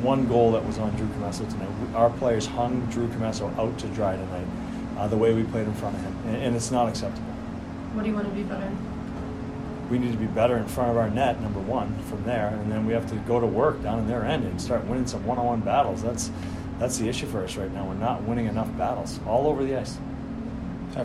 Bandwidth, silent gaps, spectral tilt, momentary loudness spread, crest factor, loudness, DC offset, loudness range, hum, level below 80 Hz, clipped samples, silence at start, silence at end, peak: 14 kHz; none; -6.5 dB/octave; 11 LU; 18 dB; -27 LUFS; under 0.1%; 3 LU; none; -44 dBFS; under 0.1%; 0 s; 0 s; -8 dBFS